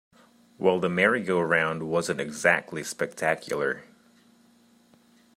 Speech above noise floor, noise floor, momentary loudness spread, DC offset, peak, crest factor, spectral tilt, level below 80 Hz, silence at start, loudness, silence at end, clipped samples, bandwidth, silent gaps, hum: 34 dB; -60 dBFS; 8 LU; under 0.1%; -6 dBFS; 22 dB; -4.5 dB/octave; -70 dBFS; 0.6 s; -26 LUFS; 1.55 s; under 0.1%; 16 kHz; none; 60 Hz at -55 dBFS